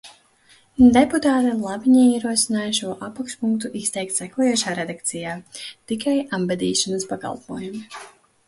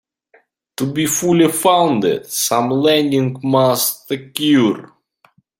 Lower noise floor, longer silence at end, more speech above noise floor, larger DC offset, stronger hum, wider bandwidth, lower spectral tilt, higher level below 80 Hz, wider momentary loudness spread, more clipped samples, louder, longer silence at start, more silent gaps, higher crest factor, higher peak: about the same, -55 dBFS vs -56 dBFS; second, 0.4 s vs 0.75 s; second, 35 dB vs 41 dB; neither; neither; second, 11.5 kHz vs 16.5 kHz; about the same, -3.5 dB/octave vs -4.5 dB/octave; first, -52 dBFS vs -60 dBFS; first, 17 LU vs 10 LU; neither; second, -20 LUFS vs -16 LUFS; second, 0.05 s vs 0.8 s; neither; about the same, 18 dB vs 16 dB; about the same, -4 dBFS vs -2 dBFS